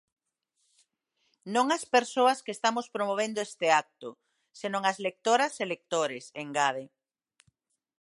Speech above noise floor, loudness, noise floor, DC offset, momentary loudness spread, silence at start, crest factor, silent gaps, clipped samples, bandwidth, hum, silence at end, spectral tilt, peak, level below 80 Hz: 50 dB; -28 LUFS; -78 dBFS; under 0.1%; 13 LU; 1.45 s; 22 dB; none; under 0.1%; 11.5 kHz; none; 1.15 s; -2.5 dB/octave; -8 dBFS; -84 dBFS